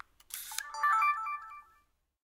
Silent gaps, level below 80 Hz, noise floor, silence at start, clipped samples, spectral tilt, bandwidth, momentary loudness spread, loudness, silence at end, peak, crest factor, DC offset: none; -74 dBFS; -71 dBFS; 0.3 s; under 0.1%; 3 dB/octave; 16 kHz; 19 LU; -32 LUFS; 0.65 s; -14 dBFS; 22 dB; under 0.1%